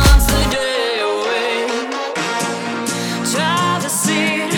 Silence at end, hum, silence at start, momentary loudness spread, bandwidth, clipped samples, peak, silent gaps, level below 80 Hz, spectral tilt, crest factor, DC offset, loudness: 0 s; none; 0 s; 6 LU; 19.5 kHz; under 0.1%; 0 dBFS; none; -22 dBFS; -3.5 dB/octave; 16 dB; under 0.1%; -17 LUFS